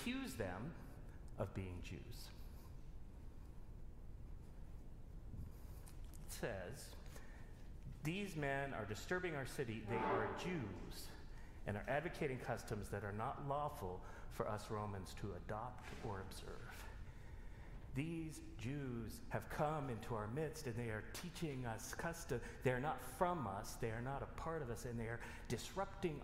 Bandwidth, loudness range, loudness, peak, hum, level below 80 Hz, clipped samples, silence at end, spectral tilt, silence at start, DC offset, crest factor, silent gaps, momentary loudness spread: 16 kHz; 9 LU; -46 LUFS; -24 dBFS; none; -56 dBFS; under 0.1%; 0 s; -5.5 dB/octave; 0 s; under 0.1%; 24 dB; none; 16 LU